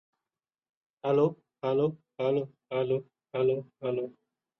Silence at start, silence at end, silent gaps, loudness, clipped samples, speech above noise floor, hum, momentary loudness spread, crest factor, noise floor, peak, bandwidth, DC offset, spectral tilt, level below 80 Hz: 1.05 s; 0.5 s; none; -31 LUFS; under 0.1%; over 61 dB; none; 9 LU; 18 dB; under -90 dBFS; -14 dBFS; 6 kHz; under 0.1%; -9 dB/octave; -74 dBFS